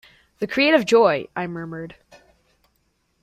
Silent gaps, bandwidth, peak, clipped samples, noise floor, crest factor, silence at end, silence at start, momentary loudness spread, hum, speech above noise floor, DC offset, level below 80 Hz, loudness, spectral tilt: none; 14.5 kHz; -4 dBFS; under 0.1%; -68 dBFS; 20 dB; 1.35 s; 0.4 s; 19 LU; none; 48 dB; under 0.1%; -62 dBFS; -20 LUFS; -5 dB/octave